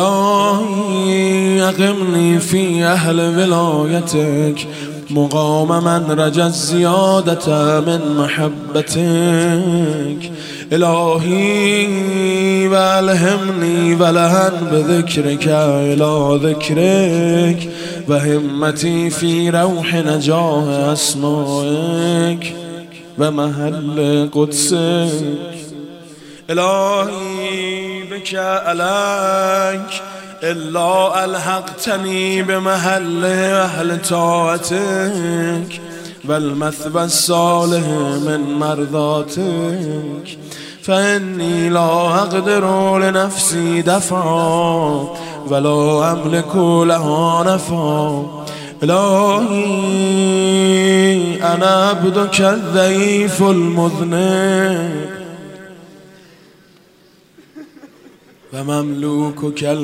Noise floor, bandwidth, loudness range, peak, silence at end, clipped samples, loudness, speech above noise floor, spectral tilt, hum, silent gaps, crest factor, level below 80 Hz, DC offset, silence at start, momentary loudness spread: -49 dBFS; 16 kHz; 5 LU; 0 dBFS; 0 s; under 0.1%; -15 LUFS; 35 dB; -5 dB/octave; none; none; 14 dB; -58 dBFS; under 0.1%; 0 s; 10 LU